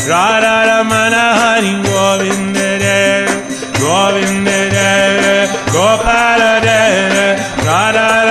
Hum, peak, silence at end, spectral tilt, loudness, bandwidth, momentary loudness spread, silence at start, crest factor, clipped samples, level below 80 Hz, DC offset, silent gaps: none; 0 dBFS; 0 s; -3.5 dB/octave; -11 LUFS; 13 kHz; 5 LU; 0 s; 12 dB; under 0.1%; -36 dBFS; 0.2%; none